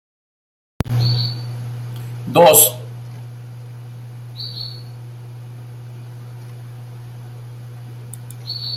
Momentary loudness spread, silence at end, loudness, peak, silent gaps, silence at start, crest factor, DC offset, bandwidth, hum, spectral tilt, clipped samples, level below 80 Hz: 23 LU; 0 s; -17 LUFS; 0 dBFS; none; 0.85 s; 22 dB; under 0.1%; 16 kHz; none; -3.5 dB/octave; under 0.1%; -48 dBFS